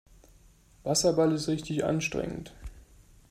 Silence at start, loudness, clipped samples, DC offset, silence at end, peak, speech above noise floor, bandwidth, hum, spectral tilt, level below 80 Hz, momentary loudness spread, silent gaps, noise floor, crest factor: 0.85 s; -28 LUFS; under 0.1%; under 0.1%; 0.5 s; -12 dBFS; 30 dB; 15.5 kHz; none; -4.5 dB/octave; -52 dBFS; 21 LU; none; -58 dBFS; 18 dB